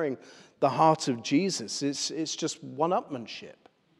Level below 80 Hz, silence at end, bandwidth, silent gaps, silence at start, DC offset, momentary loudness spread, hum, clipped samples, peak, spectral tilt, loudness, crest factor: -84 dBFS; 0.5 s; 12.5 kHz; none; 0 s; under 0.1%; 15 LU; none; under 0.1%; -10 dBFS; -4 dB/octave; -28 LUFS; 20 dB